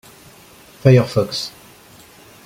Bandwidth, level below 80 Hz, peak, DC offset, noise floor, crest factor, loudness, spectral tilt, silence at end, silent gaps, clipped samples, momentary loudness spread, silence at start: 15.5 kHz; -52 dBFS; -2 dBFS; under 0.1%; -45 dBFS; 18 dB; -16 LUFS; -6.5 dB/octave; 0.95 s; none; under 0.1%; 13 LU; 0.85 s